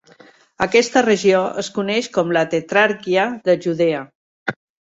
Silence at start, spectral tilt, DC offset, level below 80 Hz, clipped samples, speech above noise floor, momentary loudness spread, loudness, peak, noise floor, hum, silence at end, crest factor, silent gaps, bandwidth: 0.6 s; -4.5 dB/octave; under 0.1%; -60 dBFS; under 0.1%; 31 dB; 12 LU; -18 LUFS; -2 dBFS; -49 dBFS; none; 0.35 s; 18 dB; 4.15-4.46 s; 8 kHz